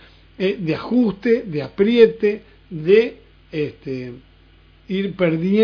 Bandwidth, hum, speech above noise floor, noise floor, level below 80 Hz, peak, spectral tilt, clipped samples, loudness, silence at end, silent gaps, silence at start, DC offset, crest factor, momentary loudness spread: 5.4 kHz; none; 32 dB; -50 dBFS; -52 dBFS; 0 dBFS; -8.5 dB/octave; under 0.1%; -19 LUFS; 0 s; none; 0.4 s; under 0.1%; 20 dB; 16 LU